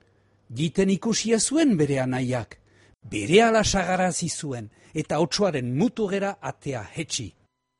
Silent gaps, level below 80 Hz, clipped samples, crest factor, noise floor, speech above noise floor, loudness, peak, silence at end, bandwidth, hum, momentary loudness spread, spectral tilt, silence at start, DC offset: none; -50 dBFS; under 0.1%; 20 dB; -62 dBFS; 38 dB; -24 LUFS; -4 dBFS; 0.5 s; 11.5 kHz; none; 14 LU; -4.5 dB/octave; 0.5 s; under 0.1%